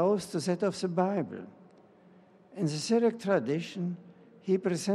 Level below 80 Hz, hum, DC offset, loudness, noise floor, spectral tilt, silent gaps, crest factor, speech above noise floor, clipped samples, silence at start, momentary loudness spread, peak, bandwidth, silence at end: -78 dBFS; none; under 0.1%; -30 LUFS; -58 dBFS; -6 dB/octave; none; 18 dB; 29 dB; under 0.1%; 0 s; 16 LU; -14 dBFS; 13 kHz; 0 s